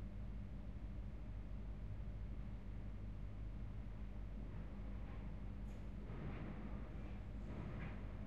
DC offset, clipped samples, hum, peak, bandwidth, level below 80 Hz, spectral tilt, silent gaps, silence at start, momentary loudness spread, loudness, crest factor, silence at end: 0.2%; under 0.1%; 50 Hz at -60 dBFS; -36 dBFS; 5.6 kHz; -50 dBFS; -8.5 dB/octave; none; 0 s; 2 LU; -52 LUFS; 12 dB; 0 s